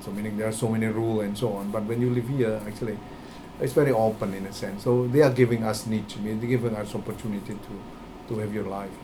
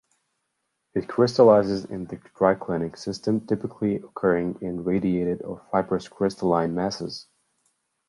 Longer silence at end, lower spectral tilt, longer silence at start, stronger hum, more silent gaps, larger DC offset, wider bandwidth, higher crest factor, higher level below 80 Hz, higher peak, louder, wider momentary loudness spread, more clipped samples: second, 0 s vs 0.85 s; about the same, -7 dB/octave vs -7 dB/octave; second, 0 s vs 0.95 s; neither; neither; neither; first, 19 kHz vs 11.5 kHz; about the same, 20 dB vs 20 dB; about the same, -52 dBFS vs -56 dBFS; about the same, -6 dBFS vs -4 dBFS; about the same, -26 LUFS vs -24 LUFS; about the same, 16 LU vs 14 LU; neither